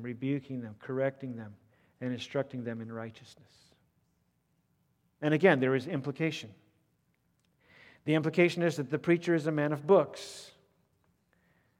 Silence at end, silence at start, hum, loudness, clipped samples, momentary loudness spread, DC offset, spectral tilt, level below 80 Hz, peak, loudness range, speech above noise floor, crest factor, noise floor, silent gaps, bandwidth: 1.3 s; 0 s; none; -30 LUFS; under 0.1%; 17 LU; under 0.1%; -6.5 dB/octave; -80 dBFS; -10 dBFS; 11 LU; 44 dB; 24 dB; -75 dBFS; none; 13.5 kHz